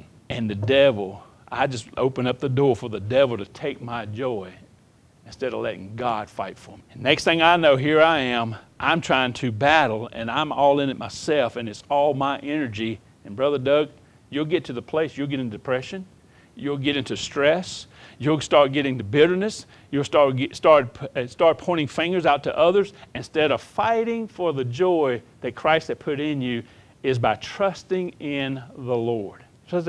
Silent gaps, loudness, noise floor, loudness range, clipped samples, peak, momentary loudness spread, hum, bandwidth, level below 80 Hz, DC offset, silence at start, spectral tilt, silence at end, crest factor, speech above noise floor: none; -22 LUFS; -55 dBFS; 6 LU; under 0.1%; -2 dBFS; 13 LU; none; 11 kHz; -58 dBFS; under 0.1%; 0.3 s; -5.5 dB/octave; 0 s; 22 dB; 33 dB